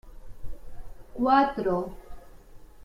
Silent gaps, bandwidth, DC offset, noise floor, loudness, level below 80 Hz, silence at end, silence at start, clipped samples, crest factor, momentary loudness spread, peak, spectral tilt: none; 15.5 kHz; under 0.1%; -47 dBFS; -25 LUFS; -46 dBFS; 0 s; 0.05 s; under 0.1%; 20 dB; 26 LU; -8 dBFS; -7 dB/octave